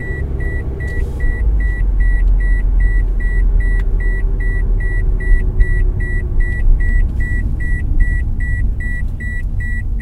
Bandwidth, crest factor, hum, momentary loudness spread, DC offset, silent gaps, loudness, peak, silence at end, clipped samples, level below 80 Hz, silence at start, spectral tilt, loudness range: 2.5 kHz; 14 dB; none; 5 LU; under 0.1%; none; -19 LUFS; 0 dBFS; 0 s; under 0.1%; -14 dBFS; 0 s; -8.5 dB/octave; 2 LU